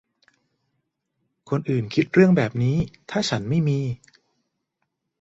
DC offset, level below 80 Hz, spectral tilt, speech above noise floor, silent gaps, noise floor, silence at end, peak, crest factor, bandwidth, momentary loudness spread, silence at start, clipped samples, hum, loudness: under 0.1%; -54 dBFS; -7 dB/octave; 57 dB; none; -78 dBFS; 1.25 s; -4 dBFS; 20 dB; 8 kHz; 11 LU; 1.45 s; under 0.1%; none; -22 LUFS